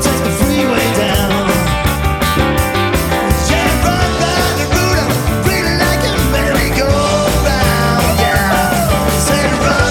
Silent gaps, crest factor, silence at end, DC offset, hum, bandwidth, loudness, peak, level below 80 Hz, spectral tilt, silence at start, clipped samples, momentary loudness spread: none; 12 dB; 0 s; under 0.1%; none; 19 kHz; -13 LUFS; 0 dBFS; -22 dBFS; -4.5 dB/octave; 0 s; under 0.1%; 2 LU